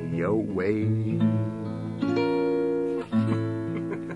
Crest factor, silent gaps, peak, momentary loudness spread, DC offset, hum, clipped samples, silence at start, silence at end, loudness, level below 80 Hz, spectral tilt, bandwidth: 14 dB; none; -12 dBFS; 6 LU; under 0.1%; none; under 0.1%; 0 s; 0 s; -27 LUFS; -62 dBFS; -9 dB/octave; 11 kHz